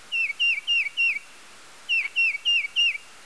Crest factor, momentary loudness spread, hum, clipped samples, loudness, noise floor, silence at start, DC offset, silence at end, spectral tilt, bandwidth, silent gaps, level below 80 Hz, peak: 12 dB; 5 LU; none; under 0.1%; -22 LUFS; -48 dBFS; 0.1 s; 0.3%; 0.25 s; 3 dB/octave; 11 kHz; none; -74 dBFS; -14 dBFS